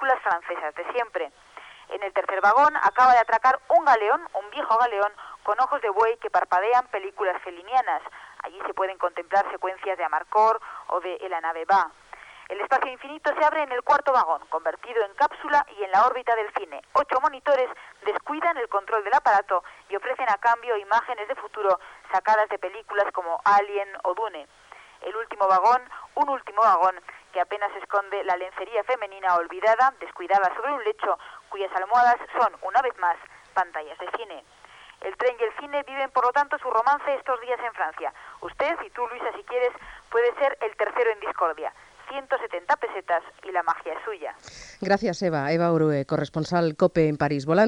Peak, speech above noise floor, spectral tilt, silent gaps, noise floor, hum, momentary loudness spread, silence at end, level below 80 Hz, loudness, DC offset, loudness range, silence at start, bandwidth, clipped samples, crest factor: -8 dBFS; 23 dB; -5.5 dB/octave; none; -48 dBFS; none; 13 LU; 0 s; -64 dBFS; -24 LUFS; under 0.1%; 6 LU; 0 s; 10.5 kHz; under 0.1%; 16 dB